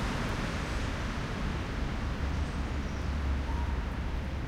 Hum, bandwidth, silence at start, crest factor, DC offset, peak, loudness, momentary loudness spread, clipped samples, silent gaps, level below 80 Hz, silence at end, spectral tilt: none; 12.5 kHz; 0 s; 12 dB; under 0.1%; -20 dBFS; -34 LUFS; 2 LU; under 0.1%; none; -34 dBFS; 0 s; -6 dB/octave